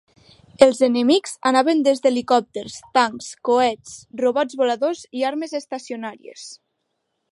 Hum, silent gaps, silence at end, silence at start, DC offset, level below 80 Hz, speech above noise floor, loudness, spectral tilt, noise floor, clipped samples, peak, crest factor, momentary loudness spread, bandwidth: none; none; 0.8 s; 0.6 s; under 0.1%; -64 dBFS; 55 dB; -20 LUFS; -3 dB/octave; -74 dBFS; under 0.1%; 0 dBFS; 20 dB; 17 LU; 11.5 kHz